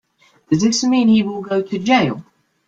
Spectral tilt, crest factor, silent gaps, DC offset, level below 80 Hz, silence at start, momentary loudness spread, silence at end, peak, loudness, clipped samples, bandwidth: -4.5 dB/octave; 16 dB; none; under 0.1%; -56 dBFS; 0.5 s; 8 LU; 0.45 s; -2 dBFS; -17 LUFS; under 0.1%; 9 kHz